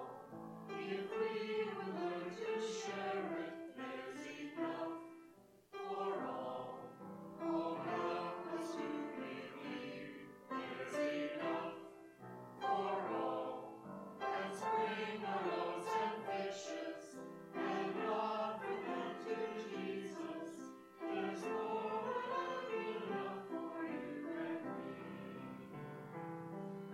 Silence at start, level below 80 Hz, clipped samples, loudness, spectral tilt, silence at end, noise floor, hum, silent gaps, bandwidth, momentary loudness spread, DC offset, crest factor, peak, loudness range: 0 s; -88 dBFS; under 0.1%; -43 LUFS; -5 dB/octave; 0 s; -64 dBFS; none; none; 14 kHz; 12 LU; under 0.1%; 18 dB; -26 dBFS; 4 LU